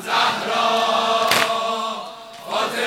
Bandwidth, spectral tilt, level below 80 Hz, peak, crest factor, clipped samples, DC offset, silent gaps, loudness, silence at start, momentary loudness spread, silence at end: 17.5 kHz; -1.5 dB/octave; -68 dBFS; 0 dBFS; 20 dB; under 0.1%; under 0.1%; none; -19 LUFS; 0 s; 13 LU; 0 s